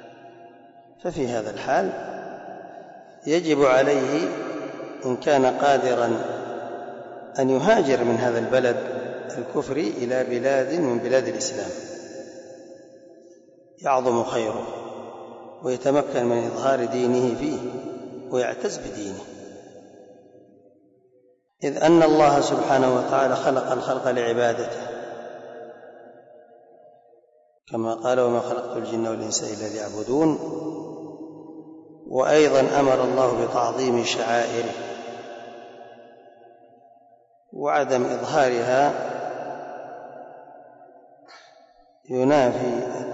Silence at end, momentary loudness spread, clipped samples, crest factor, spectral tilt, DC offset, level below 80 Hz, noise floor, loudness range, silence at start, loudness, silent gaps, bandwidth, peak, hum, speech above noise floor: 0 s; 20 LU; under 0.1%; 16 dB; -5 dB/octave; under 0.1%; -62 dBFS; -60 dBFS; 9 LU; 0 s; -23 LUFS; none; 8 kHz; -8 dBFS; none; 39 dB